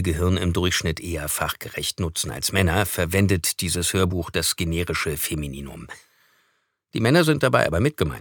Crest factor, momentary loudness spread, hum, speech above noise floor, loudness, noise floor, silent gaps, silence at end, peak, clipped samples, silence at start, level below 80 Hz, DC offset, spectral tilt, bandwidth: 22 dB; 9 LU; none; 47 dB; -22 LUFS; -69 dBFS; none; 0 s; -2 dBFS; under 0.1%; 0 s; -40 dBFS; under 0.1%; -4.5 dB/octave; 19 kHz